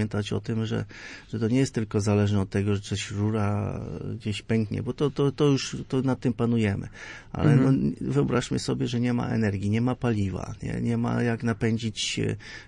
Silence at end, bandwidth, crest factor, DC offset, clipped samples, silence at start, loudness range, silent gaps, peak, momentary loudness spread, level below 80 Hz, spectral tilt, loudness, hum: 0 s; 11 kHz; 18 dB; under 0.1%; under 0.1%; 0 s; 2 LU; none; -8 dBFS; 9 LU; -50 dBFS; -6.5 dB/octave; -26 LUFS; none